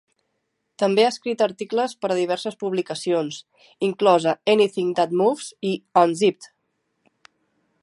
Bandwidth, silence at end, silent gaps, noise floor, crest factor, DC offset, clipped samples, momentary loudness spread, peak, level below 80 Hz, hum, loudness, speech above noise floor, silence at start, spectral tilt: 11.5 kHz; 1.35 s; none; -75 dBFS; 20 dB; under 0.1%; under 0.1%; 9 LU; -2 dBFS; -76 dBFS; none; -22 LUFS; 54 dB; 0.8 s; -5 dB/octave